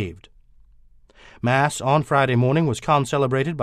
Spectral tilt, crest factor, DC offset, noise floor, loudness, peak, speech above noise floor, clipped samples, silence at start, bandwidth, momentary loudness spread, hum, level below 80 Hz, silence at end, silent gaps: -6 dB/octave; 16 dB; under 0.1%; -51 dBFS; -20 LUFS; -4 dBFS; 32 dB; under 0.1%; 0 s; 13 kHz; 3 LU; none; -50 dBFS; 0 s; none